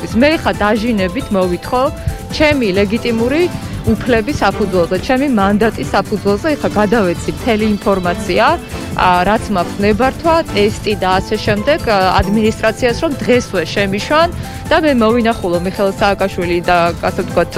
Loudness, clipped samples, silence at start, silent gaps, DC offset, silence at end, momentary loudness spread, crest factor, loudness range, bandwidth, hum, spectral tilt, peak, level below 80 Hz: -14 LUFS; under 0.1%; 0 s; none; under 0.1%; 0 s; 5 LU; 14 dB; 1 LU; 16 kHz; none; -5.5 dB/octave; 0 dBFS; -30 dBFS